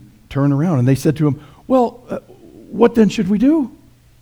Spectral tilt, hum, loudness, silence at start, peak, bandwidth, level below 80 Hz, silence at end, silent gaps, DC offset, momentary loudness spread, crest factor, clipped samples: -8 dB/octave; none; -16 LUFS; 0.3 s; 0 dBFS; 19.5 kHz; -46 dBFS; 0.5 s; none; under 0.1%; 15 LU; 16 dB; under 0.1%